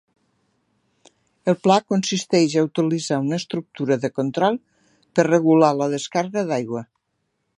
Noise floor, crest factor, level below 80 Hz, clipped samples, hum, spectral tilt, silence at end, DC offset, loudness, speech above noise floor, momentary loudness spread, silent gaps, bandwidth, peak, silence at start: -74 dBFS; 20 dB; -70 dBFS; under 0.1%; none; -5.5 dB/octave; 0.75 s; under 0.1%; -21 LUFS; 54 dB; 10 LU; none; 11 kHz; -2 dBFS; 1.45 s